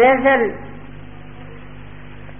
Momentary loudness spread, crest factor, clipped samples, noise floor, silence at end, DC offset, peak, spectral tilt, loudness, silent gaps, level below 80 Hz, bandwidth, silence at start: 24 LU; 16 dB; under 0.1%; -37 dBFS; 0.1 s; 2%; -2 dBFS; 0 dB/octave; -16 LUFS; none; -44 dBFS; 3.5 kHz; 0 s